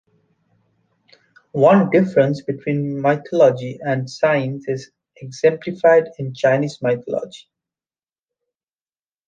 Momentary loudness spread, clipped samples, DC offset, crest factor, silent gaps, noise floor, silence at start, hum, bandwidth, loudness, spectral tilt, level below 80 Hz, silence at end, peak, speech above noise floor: 13 LU; under 0.1%; under 0.1%; 18 dB; none; under -90 dBFS; 1.55 s; none; 9 kHz; -18 LUFS; -7.5 dB/octave; -64 dBFS; 1.9 s; -2 dBFS; over 72 dB